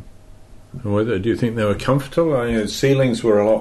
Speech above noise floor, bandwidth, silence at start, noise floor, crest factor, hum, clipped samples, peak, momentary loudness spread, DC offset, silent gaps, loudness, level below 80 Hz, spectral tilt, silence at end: 23 dB; 12.5 kHz; 0 s; -41 dBFS; 14 dB; none; under 0.1%; -6 dBFS; 5 LU; under 0.1%; none; -19 LUFS; -42 dBFS; -6.5 dB/octave; 0 s